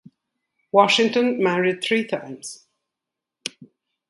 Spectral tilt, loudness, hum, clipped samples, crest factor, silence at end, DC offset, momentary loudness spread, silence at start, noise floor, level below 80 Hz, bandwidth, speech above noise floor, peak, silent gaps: -4 dB/octave; -20 LUFS; none; under 0.1%; 22 dB; 0.45 s; under 0.1%; 18 LU; 0.75 s; -85 dBFS; -72 dBFS; 11.5 kHz; 66 dB; 0 dBFS; none